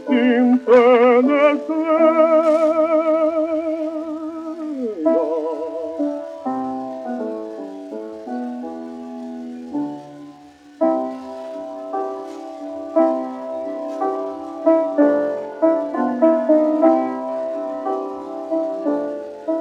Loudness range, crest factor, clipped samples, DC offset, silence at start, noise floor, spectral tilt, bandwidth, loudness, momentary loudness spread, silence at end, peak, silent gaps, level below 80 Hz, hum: 13 LU; 18 dB; under 0.1%; under 0.1%; 0 s; -44 dBFS; -6 dB/octave; 8.2 kHz; -19 LUFS; 17 LU; 0 s; -2 dBFS; none; -70 dBFS; none